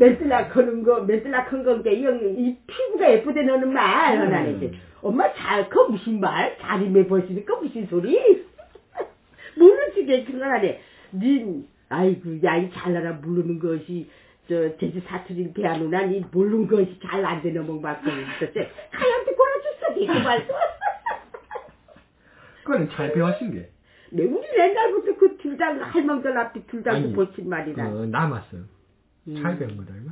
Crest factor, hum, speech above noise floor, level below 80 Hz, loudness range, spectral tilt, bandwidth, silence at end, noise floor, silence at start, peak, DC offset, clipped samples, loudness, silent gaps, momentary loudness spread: 20 dB; none; 39 dB; -58 dBFS; 7 LU; -10.5 dB/octave; 4 kHz; 0 s; -61 dBFS; 0 s; -2 dBFS; under 0.1%; under 0.1%; -22 LUFS; none; 14 LU